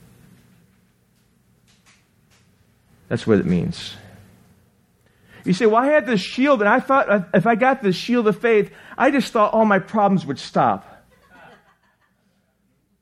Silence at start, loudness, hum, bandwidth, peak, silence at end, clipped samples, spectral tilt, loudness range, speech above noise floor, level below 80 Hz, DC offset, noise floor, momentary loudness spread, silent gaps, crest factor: 3.1 s; -19 LUFS; none; 13 kHz; -2 dBFS; 2.2 s; under 0.1%; -6.5 dB/octave; 8 LU; 47 dB; -56 dBFS; under 0.1%; -65 dBFS; 12 LU; none; 18 dB